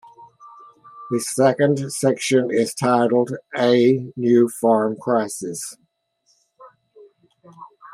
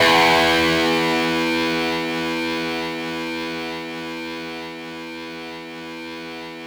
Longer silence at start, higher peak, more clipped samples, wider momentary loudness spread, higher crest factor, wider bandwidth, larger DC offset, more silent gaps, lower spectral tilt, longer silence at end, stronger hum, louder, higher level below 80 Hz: first, 0.2 s vs 0 s; first, -2 dBFS vs -6 dBFS; neither; second, 10 LU vs 17 LU; about the same, 18 dB vs 16 dB; second, 15 kHz vs over 20 kHz; neither; neither; first, -5.5 dB/octave vs -3.5 dB/octave; about the same, 0 s vs 0 s; neither; about the same, -19 LUFS vs -20 LUFS; second, -68 dBFS vs -52 dBFS